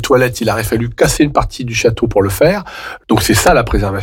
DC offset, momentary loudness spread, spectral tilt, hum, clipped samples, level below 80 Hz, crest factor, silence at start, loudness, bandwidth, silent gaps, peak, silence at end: under 0.1%; 8 LU; -5 dB/octave; none; under 0.1%; -26 dBFS; 12 dB; 0 s; -13 LUFS; 17 kHz; none; -2 dBFS; 0 s